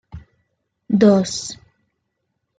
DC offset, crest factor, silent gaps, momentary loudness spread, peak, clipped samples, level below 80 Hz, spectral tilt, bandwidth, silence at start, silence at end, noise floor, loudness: under 0.1%; 20 dB; none; 19 LU; -2 dBFS; under 0.1%; -54 dBFS; -5.5 dB/octave; 9.4 kHz; 0.15 s; 1.05 s; -74 dBFS; -17 LUFS